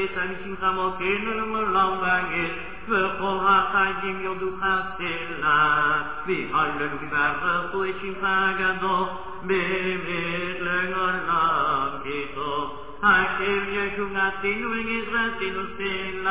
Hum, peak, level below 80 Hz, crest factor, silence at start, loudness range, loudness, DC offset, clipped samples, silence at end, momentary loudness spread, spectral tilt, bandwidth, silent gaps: none; -6 dBFS; -50 dBFS; 18 dB; 0 s; 2 LU; -24 LUFS; 1%; under 0.1%; 0 s; 9 LU; -8 dB/octave; 4 kHz; none